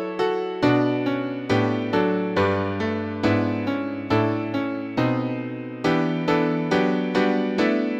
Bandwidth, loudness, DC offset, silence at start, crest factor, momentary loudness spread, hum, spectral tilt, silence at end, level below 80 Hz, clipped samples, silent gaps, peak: 8.2 kHz; -23 LUFS; under 0.1%; 0 s; 16 dB; 5 LU; none; -7.5 dB/octave; 0 s; -56 dBFS; under 0.1%; none; -6 dBFS